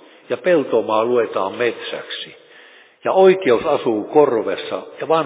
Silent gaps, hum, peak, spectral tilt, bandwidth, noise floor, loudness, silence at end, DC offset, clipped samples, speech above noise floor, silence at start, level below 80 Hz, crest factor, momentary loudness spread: none; none; -2 dBFS; -9.5 dB/octave; 4 kHz; -46 dBFS; -18 LUFS; 0 s; under 0.1%; under 0.1%; 29 dB; 0.3 s; -62 dBFS; 16 dB; 15 LU